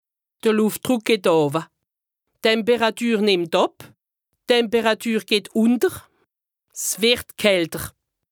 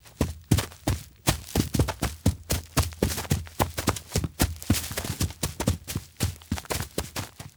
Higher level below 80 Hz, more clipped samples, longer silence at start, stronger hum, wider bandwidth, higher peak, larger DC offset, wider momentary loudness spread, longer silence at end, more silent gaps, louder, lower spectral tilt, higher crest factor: second, -58 dBFS vs -36 dBFS; neither; first, 0.45 s vs 0.05 s; neither; about the same, over 20 kHz vs over 20 kHz; about the same, -2 dBFS vs -4 dBFS; neither; first, 9 LU vs 6 LU; first, 0.45 s vs 0.05 s; neither; first, -20 LUFS vs -29 LUFS; about the same, -3.5 dB/octave vs -4.5 dB/octave; about the same, 20 dB vs 24 dB